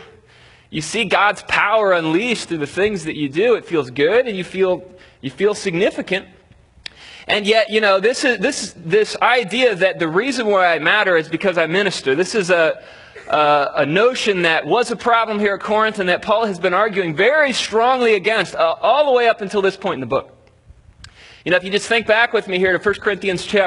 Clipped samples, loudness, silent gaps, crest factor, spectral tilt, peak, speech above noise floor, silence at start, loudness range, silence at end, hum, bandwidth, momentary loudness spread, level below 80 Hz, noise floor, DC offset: under 0.1%; -17 LUFS; none; 18 dB; -4 dB/octave; 0 dBFS; 32 dB; 0 s; 3 LU; 0 s; none; 11 kHz; 8 LU; -54 dBFS; -49 dBFS; under 0.1%